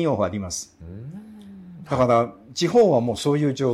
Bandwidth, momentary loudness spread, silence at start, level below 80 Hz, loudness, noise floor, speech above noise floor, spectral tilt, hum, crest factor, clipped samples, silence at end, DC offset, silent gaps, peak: 14.5 kHz; 24 LU; 0 s; -52 dBFS; -21 LUFS; -42 dBFS; 21 dB; -6 dB/octave; none; 16 dB; under 0.1%; 0 s; under 0.1%; none; -6 dBFS